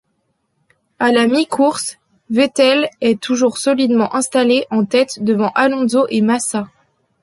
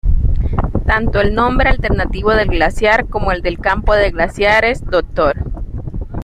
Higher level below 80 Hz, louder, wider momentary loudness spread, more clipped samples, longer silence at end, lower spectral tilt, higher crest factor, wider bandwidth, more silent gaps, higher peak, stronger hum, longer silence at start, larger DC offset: second, -62 dBFS vs -20 dBFS; about the same, -15 LUFS vs -15 LUFS; about the same, 6 LU vs 7 LU; neither; first, 0.55 s vs 0 s; second, -4 dB/octave vs -6.5 dB/octave; about the same, 14 dB vs 14 dB; first, 11.5 kHz vs 10 kHz; neither; about the same, -2 dBFS vs 0 dBFS; neither; first, 1 s vs 0.05 s; neither